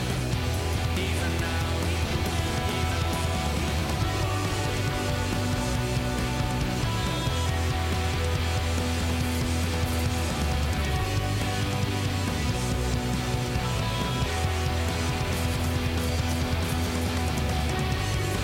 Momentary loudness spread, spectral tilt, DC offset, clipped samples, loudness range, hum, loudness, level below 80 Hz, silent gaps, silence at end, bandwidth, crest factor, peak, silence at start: 1 LU; -5 dB/octave; under 0.1%; under 0.1%; 0 LU; none; -27 LUFS; -34 dBFS; none; 0 s; 17 kHz; 10 dB; -16 dBFS; 0 s